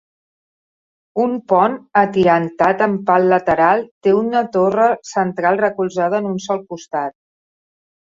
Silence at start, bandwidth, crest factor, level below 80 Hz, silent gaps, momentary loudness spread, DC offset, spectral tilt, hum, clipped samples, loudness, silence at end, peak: 1.15 s; 7.8 kHz; 16 dB; -56 dBFS; 3.91-4.01 s; 10 LU; under 0.1%; -6.5 dB/octave; none; under 0.1%; -17 LUFS; 1 s; 0 dBFS